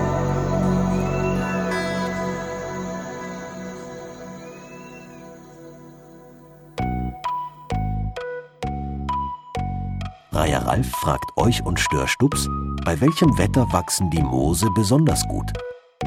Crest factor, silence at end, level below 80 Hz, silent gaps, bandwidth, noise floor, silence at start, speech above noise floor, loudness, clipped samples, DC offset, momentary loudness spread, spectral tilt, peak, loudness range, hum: 20 dB; 0 s; -34 dBFS; none; 19 kHz; -45 dBFS; 0 s; 26 dB; -23 LUFS; under 0.1%; under 0.1%; 18 LU; -5.5 dB/octave; -2 dBFS; 15 LU; none